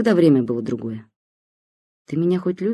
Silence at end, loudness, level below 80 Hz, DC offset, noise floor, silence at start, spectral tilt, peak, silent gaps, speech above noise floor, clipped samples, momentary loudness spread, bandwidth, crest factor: 0 s; -20 LUFS; -64 dBFS; under 0.1%; under -90 dBFS; 0 s; -8.5 dB/octave; -4 dBFS; 1.16-2.05 s; over 71 dB; under 0.1%; 15 LU; 12 kHz; 16 dB